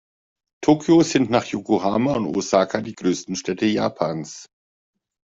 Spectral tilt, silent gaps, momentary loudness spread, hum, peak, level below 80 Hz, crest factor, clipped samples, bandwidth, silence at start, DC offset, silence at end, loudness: -5.5 dB/octave; none; 10 LU; none; -4 dBFS; -58 dBFS; 18 dB; under 0.1%; 7.8 kHz; 0.6 s; under 0.1%; 0.85 s; -21 LUFS